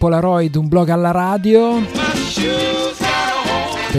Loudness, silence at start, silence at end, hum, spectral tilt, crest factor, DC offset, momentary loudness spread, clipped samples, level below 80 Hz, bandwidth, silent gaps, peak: -16 LUFS; 0 s; 0 s; none; -5.5 dB/octave; 14 dB; under 0.1%; 5 LU; under 0.1%; -40 dBFS; 15 kHz; none; 0 dBFS